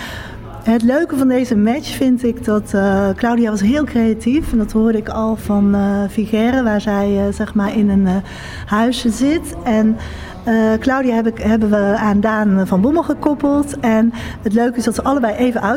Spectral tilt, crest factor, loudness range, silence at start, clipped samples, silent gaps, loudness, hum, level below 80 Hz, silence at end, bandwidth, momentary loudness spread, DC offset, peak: -6.5 dB/octave; 12 dB; 2 LU; 0 s; under 0.1%; none; -16 LUFS; none; -36 dBFS; 0 s; 16 kHz; 4 LU; under 0.1%; -4 dBFS